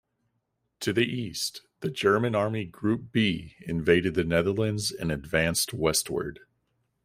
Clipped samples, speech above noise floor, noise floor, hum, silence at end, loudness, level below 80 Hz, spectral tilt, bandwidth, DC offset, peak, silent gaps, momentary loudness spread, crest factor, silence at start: under 0.1%; 51 dB; -78 dBFS; none; 0.7 s; -27 LUFS; -54 dBFS; -4.5 dB/octave; 16 kHz; under 0.1%; -6 dBFS; none; 10 LU; 22 dB; 0.8 s